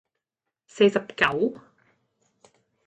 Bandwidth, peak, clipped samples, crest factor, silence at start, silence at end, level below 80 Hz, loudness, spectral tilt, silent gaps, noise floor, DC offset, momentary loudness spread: 8.6 kHz; -6 dBFS; under 0.1%; 22 dB; 0.75 s; 1.35 s; -64 dBFS; -23 LUFS; -5 dB/octave; none; -86 dBFS; under 0.1%; 6 LU